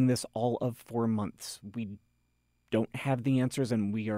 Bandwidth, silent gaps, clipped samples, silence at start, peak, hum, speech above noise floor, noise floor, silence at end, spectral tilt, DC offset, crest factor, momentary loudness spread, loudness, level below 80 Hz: 16 kHz; none; under 0.1%; 0 s; -18 dBFS; 60 Hz at -55 dBFS; 44 dB; -74 dBFS; 0 s; -6.5 dB/octave; under 0.1%; 14 dB; 11 LU; -32 LUFS; -68 dBFS